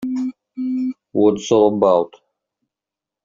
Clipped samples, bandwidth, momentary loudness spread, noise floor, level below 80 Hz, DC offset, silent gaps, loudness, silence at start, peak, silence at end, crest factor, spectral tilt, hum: under 0.1%; 7.6 kHz; 13 LU; -87 dBFS; -60 dBFS; under 0.1%; none; -18 LUFS; 0 s; -2 dBFS; 1.15 s; 16 dB; -6.5 dB/octave; none